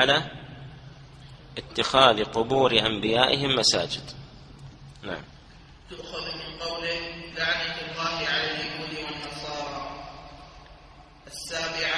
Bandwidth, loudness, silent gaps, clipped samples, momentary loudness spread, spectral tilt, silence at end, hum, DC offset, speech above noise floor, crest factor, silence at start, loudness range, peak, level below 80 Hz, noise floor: 11 kHz; -25 LUFS; none; under 0.1%; 24 LU; -3 dB/octave; 0 s; none; under 0.1%; 25 dB; 26 dB; 0 s; 12 LU; -2 dBFS; -52 dBFS; -50 dBFS